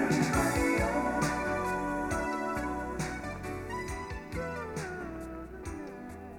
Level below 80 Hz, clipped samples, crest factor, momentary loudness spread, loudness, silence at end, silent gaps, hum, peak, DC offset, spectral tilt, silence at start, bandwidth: -46 dBFS; under 0.1%; 18 dB; 14 LU; -33 LUFS; 0 s; none; none; -16 dBFS; under 0.1%; -5.5 dB/octave; 0 s; 20 kHz